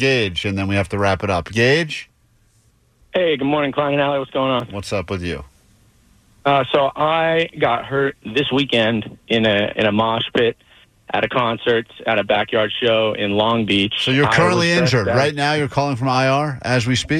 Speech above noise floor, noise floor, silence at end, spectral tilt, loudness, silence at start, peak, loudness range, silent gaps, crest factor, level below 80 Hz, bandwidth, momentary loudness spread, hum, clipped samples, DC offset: 39 dB; -57 dBFS; 0 s; -5.5 dB/octave; -18 LUFS; 0 s; -4 dBFS; 5 LU; none; 14 dB; -48 dBFS; 13 kHz; 6 LU; none; under 0.1%; under 0.1%